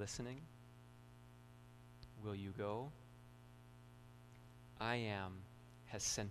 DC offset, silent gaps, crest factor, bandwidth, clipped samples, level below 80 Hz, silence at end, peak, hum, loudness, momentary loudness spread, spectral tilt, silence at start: under 0.1%; none; 24 dB; 13 kHz; under 0.1%; -68 dBFS; 0 s; -26 dBFS; 60 Hz at -60 dBFS; -46 LUFS; 20 LU; -3.5 dB/octave; 0 s